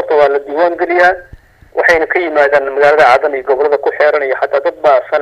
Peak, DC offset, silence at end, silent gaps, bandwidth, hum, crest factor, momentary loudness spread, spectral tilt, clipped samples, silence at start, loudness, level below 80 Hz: 0 dBFS; under 0.1%; 0 s; none; 10.5 kHz; none; 12 dB; 6 LU; -4.5 dB/octave; 0.3%; 0 s; -11 LUFS; -46 dBFS